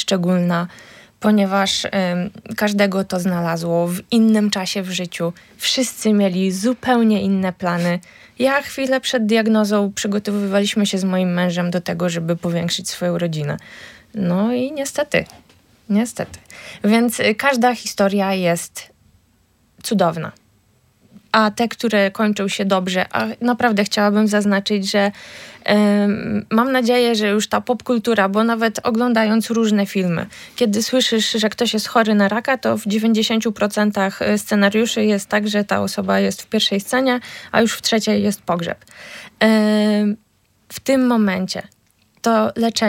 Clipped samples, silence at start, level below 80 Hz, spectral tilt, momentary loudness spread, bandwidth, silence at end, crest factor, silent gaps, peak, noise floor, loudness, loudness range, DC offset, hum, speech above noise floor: under 0.1%; 0 s; -60 dBFS; -5 dB/octave; 8 LU; 16.5 kHz; 0 s; 18 dB; none; -2 dBFS; -58 dBFS; -18 LUFS; 4 LU; under 0.1%; none; 41 dB